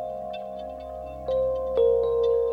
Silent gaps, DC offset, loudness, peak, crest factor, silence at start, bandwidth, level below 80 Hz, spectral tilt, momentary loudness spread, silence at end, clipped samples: none; under 0.1%; -26 LUFS; -12 dBFS; 14 dB; 0 s; 5 kHz; -46 dBFS; -7 dB/octave; 15 LU; 0 s; under 0.1%